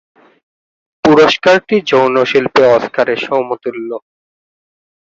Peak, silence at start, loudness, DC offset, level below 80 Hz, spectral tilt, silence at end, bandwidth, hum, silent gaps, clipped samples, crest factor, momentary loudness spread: 0 dBFS; 1.05 s; -11 LUFS; under 0.1%; -52 dBFS; -5 dB/octave; 1.1 s; 7.8 kHz; none; none; under 0.1%; 14 dB; 13 LU